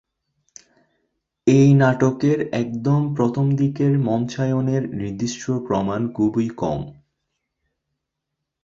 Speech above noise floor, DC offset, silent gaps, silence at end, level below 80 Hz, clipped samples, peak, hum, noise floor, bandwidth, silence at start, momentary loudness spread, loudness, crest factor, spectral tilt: 62 dB; under 0.1%; none; 1.7 s; -54 dBFS; under 0.1%; -2 dBFS; none; -81 dBFS; 7.6 kHz; 1.45 s; 11 LU; -20 LUFS; 18 dB; -7.5 dB/octave